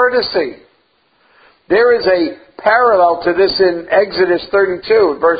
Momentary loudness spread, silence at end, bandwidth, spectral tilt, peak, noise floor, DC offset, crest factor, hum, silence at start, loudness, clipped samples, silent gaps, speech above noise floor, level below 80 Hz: 7 LU; 0 s; 5 kHz; -8 dB/octave; 0 dBFS; -57 dBFS; under 0.1%; 14 dB; none; 0 s; -13 LUFS; under 0.1%; none; 44 dB; -50 dBFS